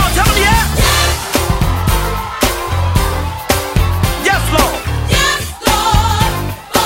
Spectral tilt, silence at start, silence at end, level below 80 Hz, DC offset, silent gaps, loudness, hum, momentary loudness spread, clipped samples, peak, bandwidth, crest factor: -3.5 dB/octave; 0 s; 0 s; -20 dBFS; under 0.1%; none; -14 LUFS; none; 6 LU; under 0.1%; 0 dBFS; 16.5 kHz; 14 dB